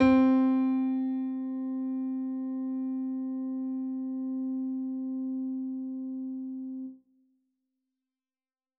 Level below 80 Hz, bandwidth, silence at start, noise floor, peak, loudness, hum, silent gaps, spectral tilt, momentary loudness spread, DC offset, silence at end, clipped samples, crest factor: -66 dBFS; 4.5 kHz; 0 s; under -90 dBFS; -12 dBFS; -31 LUFS; none; none; -6 dB/octave; 12 LU; under 0.1%; 1.85 s; under 0.1%; 20 dB